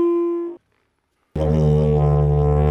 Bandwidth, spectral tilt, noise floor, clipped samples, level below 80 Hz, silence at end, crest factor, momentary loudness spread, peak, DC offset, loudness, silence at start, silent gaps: 5.8 kHz; -10.5 dB/octave; -68 dBFS; under 0.1%; -28 dBFS; 0 s; 12 dB; 11 LU; -6 dBFS; under 0.1%; -18 LUFS; 0 s; none